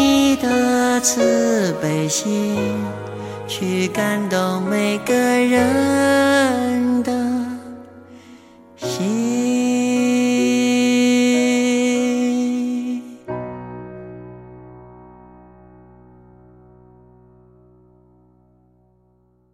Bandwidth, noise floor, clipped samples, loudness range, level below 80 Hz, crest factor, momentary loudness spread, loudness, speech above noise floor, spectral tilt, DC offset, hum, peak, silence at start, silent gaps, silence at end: 16 kHz; -59 dBFS; under 0.1%; 10 LU; -54 dBFS; 16 dB; 15 LU; -18 LUFS; 41 dB; -4 dB/octave; under 0.1%; none; -4 dBFS; 0 s; none; 4.5 s